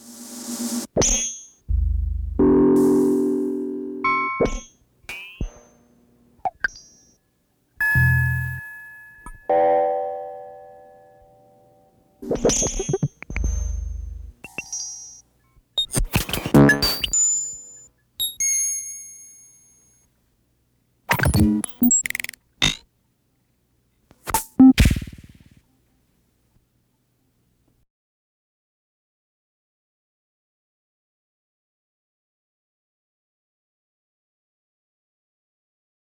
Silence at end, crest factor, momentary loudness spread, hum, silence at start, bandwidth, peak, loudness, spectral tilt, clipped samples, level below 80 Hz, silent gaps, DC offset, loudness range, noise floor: 10.85 s; 22 dB; 21 LU; none; 0.05 s; over 20 kHz; -2 dBFS; -21 LUFS; -4 dB/octave; under 0.1%; -34 dBFS; none; under 0.1%; 7 LU; -67 dBFS